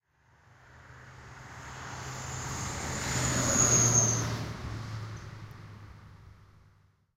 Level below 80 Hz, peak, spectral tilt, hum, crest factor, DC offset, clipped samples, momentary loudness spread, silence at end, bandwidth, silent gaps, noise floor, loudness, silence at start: -50 dBFS; -12 dBFS; -3 dB/octave; none; 22 dB; under 0.1%; under 0.1%; 27 LU; 0.7 s; 16 kHz; none; -64 dBFS; -28 LUFS; 0.7 s